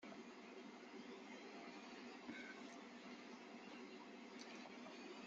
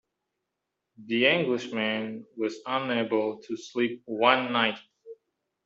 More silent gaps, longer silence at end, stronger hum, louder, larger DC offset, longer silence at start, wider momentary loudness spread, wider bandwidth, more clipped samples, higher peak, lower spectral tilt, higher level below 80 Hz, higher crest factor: neither; second, 0 s vs 0.5 s; neither; second, -56 LUFS vs -27 LUFS; neither; second, 0 s vs 1 s; second, 3 LU vs 11 LU; about the same, 7.6 kHz vs 7.8 kHz; neither; second, -38 dBFS vs -6 dBFS; second, -2.5 dB/octave vs -5 dB/octave; second, under -90 dBFS vs -76 dBFS; second, 18 dB vs 24 dB